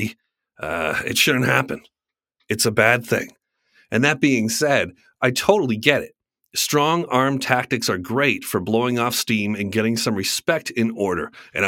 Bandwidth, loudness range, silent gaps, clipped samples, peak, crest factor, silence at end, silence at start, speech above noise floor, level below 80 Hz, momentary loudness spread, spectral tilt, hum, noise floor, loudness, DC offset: 17 kHz; 1 LU; none; under 0.1%; 0 dBFS; 22 dB; 0 s; 0 s; 55 dB; -58 dBFS; 11 LU; -4 dB/octave; none; -75 dBFS; -20 LUFS; under 0.1%